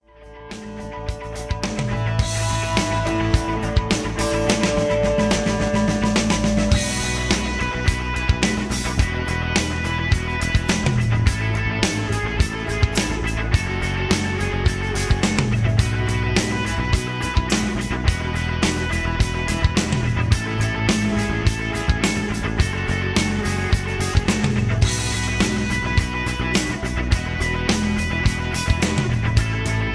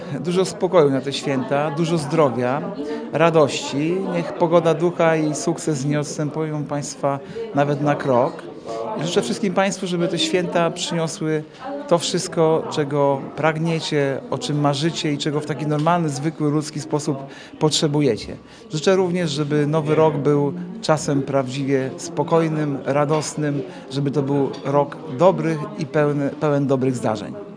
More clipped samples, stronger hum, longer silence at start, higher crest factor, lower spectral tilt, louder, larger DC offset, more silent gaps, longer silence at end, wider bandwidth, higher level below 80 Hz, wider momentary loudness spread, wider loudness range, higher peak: neither; neither; first, 0.2 s vs 0 s; about the same, 20 dB vs 20 dB; about the same, -5 dB/octave vs -5.5 dB/octave; about the same, -21 LUFS vs -21 LUFS; neither; neither; about the same, 0 s vs 0 s; about the same, 11 kHz vs 10.5 kHz; first, -28 dBFS vs -60 dBFS; second, 4 LU vs 8 LU; about the same, 2 LU vs 2 LU; about the same, -2 dBFS vs 0 dBFS